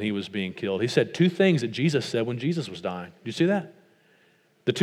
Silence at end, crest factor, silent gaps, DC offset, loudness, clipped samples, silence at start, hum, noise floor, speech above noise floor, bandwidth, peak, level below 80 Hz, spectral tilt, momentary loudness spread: 0 s; 20 dB; none; under 0.1%; -26 LUFS; under 0.1%; 0 s; none; -63 dBFS; 37 dB; 12.5 kHz; -6 dBFS; -74 dBFS; -6 dB/octave; 11 LU